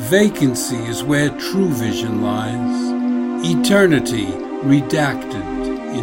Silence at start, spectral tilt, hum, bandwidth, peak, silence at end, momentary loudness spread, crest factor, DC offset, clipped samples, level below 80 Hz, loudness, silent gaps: 0 s; -5 dB/octave; none; 16.5 kHz; 0 dBFS; 0 s; 10 LU; 16 dB; under 0.1%; under 0.1%; -44 dBFS; -18 LUFS; none